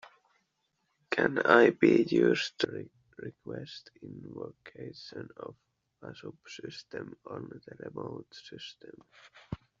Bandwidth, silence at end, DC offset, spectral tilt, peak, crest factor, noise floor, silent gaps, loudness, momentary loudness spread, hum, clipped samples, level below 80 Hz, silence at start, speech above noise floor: 7.4 kHz; 0.25 s; under 0.1%; -4 dB/octave; -6 dBFS; 26 dB; -79 dBFS; none; -27 LUFS; 24 LU; none; under 0.1%; -68 dBFS; 1.1 s; 47 dB